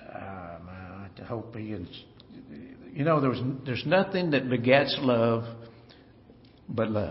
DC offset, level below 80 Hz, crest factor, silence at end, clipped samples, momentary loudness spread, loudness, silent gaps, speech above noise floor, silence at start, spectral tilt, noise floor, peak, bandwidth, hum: under 0.1%; -60 dBFS; 24 dB; 0 s; under 0.1%; 22 LU; -27 LUFS; none; 28 dB; 0 s; -5 dB/octave; -54 dBFS; -6 dBFS; 5.8 kHz; none